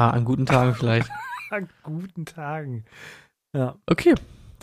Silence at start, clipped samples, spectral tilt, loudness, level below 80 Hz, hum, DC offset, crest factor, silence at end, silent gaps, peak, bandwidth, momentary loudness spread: 0 s; under 0.1%; -7.5 dB/octave; -24 LUFS; -50 dBFS; none; under 0.1%; 20 dB; 0.1 s; none; -4 dBFS; 13.5 kHz; 16 LU